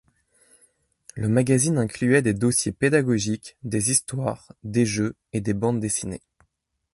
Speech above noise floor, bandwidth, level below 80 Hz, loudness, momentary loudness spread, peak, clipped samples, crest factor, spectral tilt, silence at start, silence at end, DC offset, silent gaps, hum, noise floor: 50 dB; 12 kHz; -52 dBFS; -23 LUFS; 10 LU; -6 dBFS; under 0.1%; 18 dB; -5 dB/octave; 1.15 s; 0.75 s; under 0.1%; none; none; -73 dBFS